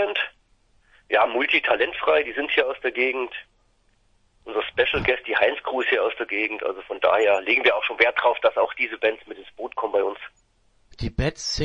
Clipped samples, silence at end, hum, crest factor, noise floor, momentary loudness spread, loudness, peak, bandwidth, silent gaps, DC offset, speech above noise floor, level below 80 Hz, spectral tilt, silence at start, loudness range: under 0.1%; 0 s; none; 22 dB; -63 dBFS; 12 LU; -22 LUFS; -2 dBFS; 9.8 kHz; none; under 0.1%; 40 dB; -46 dBFS; -4 dB/octave; 0 s; 4 LU